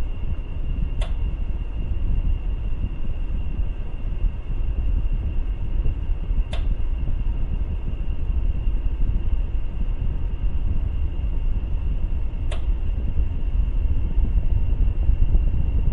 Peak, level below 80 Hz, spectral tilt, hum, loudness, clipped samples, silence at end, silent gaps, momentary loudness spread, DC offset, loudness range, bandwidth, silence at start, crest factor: -6 dBFS; -22 dBFS; -8.5 dB/octave; none; -28 LUFS; under 0.1%; 0 s; none; 6 LU; under 0.1%; 3 LU; 3.9 kHz; 0 s; 16 dB